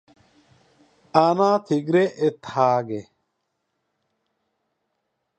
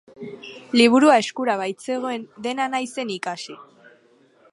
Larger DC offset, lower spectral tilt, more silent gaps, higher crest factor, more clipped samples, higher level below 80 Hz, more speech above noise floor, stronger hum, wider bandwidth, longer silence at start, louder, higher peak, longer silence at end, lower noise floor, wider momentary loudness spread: neither; first, -7 dB/octave vs -3.5 dB/octave; neither; about the same, 22 dB vs 22 dB; neither; about the same, -70 dBFS vs -74 dBFS; first, 56 dB vs 35 dB; neither; second, 9.2 kHz vs 11.5 kHz; first, 1.15 s vs 0.2 s; about the same, -21 LUFS vs -21 LUFS; about the same, -2 dBFS vs -2 dBFS; first, 2.35 s vs 0.9 s; first, -76 dBFS vs -57 dBFS; second, 7 LU vs 22 LU